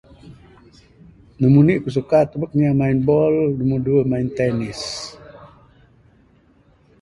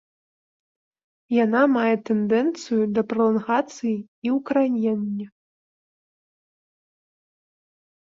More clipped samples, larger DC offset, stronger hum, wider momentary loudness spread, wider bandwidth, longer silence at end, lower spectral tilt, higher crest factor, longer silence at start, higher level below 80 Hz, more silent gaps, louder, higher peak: neither; neither; neither; first, 12 LU vs 9 LU; first, 11.5 kHz vs 7.6 kHz; second, 1.55 s vs 2.9 s; about the same, -7.5 dB/octave vs -6.5 dB/octave; about the same, 18 dB vs 18 dB; second, 0.25 s vs 1.3 s; first, -48 dBFS vs -70 dBFS; second, none vs 4.08-4.22 s; first, -18 LUFS vs -22 LUFS; first, -2 dBFS vs -8 dBFS